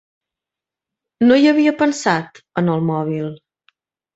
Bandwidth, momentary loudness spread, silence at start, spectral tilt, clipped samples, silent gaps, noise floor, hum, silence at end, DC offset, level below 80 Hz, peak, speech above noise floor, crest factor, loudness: 8 kHz; 13 LU; 1.2 s; -6 dB/octave; under 0.1%; none; -87 dBFS; none; 0.8 s; under 0.1%; -62 dBFS; -2 dBFS; 71 dB; 16 dB; -17 LUFS